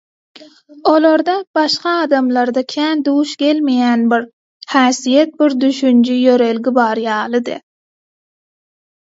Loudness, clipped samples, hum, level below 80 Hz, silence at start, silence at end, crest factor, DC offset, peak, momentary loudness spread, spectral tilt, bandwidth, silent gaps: -14 LUFS; under 0.1%; none; -68 dBFS; 0.4 s; 1.45 s; 14 dB; under 0.1%; 0 dBFS; 6 LU; -3.5 dB/octave; 7.8 kHz; 1.47-1.54 s, 4.33-4.60 s